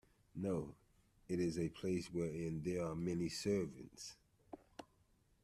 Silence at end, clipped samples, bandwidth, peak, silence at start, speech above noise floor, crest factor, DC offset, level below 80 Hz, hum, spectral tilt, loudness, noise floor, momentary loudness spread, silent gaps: 0.6 s; under 0.1%; 13.5 kHz; -26 dBFS; 0.35 s; 33 dB; 16 dB; under 0.1%; -68 dBFS; none; -6 dB/octave; -42 LUFS; -75 dBFS; 17 LU; none